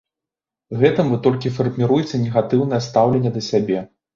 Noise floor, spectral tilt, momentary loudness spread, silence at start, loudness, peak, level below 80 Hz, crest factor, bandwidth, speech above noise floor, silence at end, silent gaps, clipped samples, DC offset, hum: -87 dBFS; -7.5 dB/octave; 5 LU; 0.7 s; -19 LUFS; -2 dBFS; -54 dBFS; 16 dB; 7.4 kHz; 70 dB; 0.3 s; none; under 0.1%; under 0.1%; none